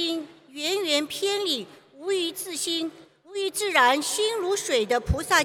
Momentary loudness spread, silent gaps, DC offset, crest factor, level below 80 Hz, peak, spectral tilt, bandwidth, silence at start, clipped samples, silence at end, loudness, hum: 13 LU; none; under 0.1%; 22 dB; -42 dBFS; -4 dBFS; -2.5 dB/octave; 18.5 kHz; 0 s; under 0.1%; 0 s; -25 LUFS; none